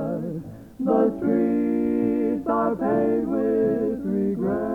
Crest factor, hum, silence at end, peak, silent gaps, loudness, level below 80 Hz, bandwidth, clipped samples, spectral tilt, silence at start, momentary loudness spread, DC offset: 16 dB; none; 0 s; -8 dBFS; none; -23 LUFS; -52 dBFS; 4.4 kHz; under 0.1%; -10 dB/octave; 0 s; 8 LU; under 0.1%